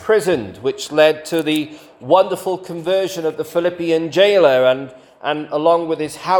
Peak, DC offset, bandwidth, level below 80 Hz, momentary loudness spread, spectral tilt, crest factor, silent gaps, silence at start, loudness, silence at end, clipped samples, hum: 0 dBFS; under 0.1%; 18 kHz; -60 dBFS; 11 LU; -4.5 dB/octave; 16 dB; none; 0 s; -17 LUFS; 0 s; under 0.1%; none